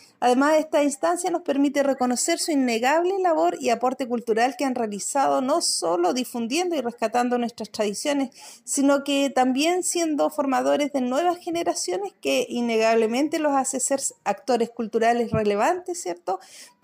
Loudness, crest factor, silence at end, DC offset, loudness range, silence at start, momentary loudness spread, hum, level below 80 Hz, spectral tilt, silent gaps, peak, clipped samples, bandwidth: -23 LUFS; 14 dB; 0.15 s; under 0.1%; 2 LU; 0.2 s; 6 LU; none; -68 dBFS; -3 dB/octave; none; -10 dBFS; under 0.1%; 16 kHz